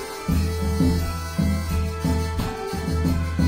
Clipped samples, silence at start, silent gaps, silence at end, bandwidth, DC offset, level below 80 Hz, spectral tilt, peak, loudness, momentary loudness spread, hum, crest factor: under 0.1%; 0 s; none; 0 s; 16 kHz; under 0.1%; -30 dBFS; -6.5 dB/octave; -10 dBFS; -24 LUFS; 5 LU; none; 14 dB